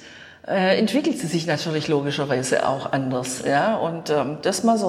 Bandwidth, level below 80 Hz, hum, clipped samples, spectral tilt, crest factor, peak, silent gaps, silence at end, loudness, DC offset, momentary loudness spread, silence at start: 15 kHz; -62 dBFS; none; under 0.1%; -4.5 dB/octave; 14 dB; -8 dBFS; none; 0 s; -22 LUFS; under 0.1%; 5 LU; 0 s